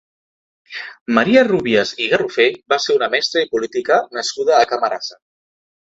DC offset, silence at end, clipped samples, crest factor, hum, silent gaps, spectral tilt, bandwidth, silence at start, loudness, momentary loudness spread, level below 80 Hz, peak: under 0.1%; 0.8 s; under 0.1%; 18 dB; none; 1.01-1.06 s; -3.5 dB/octave; 8 kHz; 0.7 s; -16 LUFS; 14 LU; -60 dBFS; 0 dBFS